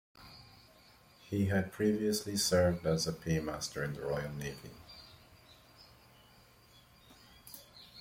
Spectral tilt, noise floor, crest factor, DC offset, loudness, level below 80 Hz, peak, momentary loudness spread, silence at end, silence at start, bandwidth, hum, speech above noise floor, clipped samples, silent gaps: -4.5 dB/octave; -62 dBFS; 20 dB; under 0.1%; -34 LUFS; -60 dBFS; -16 dBFS; 24 LU; 0 s; 0.2 s; 16.5 kHz; none; 28 dB; under 0.1%; none